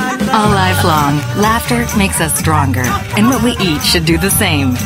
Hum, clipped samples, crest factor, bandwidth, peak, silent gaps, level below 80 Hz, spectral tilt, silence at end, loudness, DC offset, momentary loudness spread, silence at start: none; under 0.1%; 12 dB; 16.5 kHz; 0 dBFS; none; -28 dBFS; -4 dB/octave; 0 s; -12 LUFS; under 0.1%; 3 LU; 0 s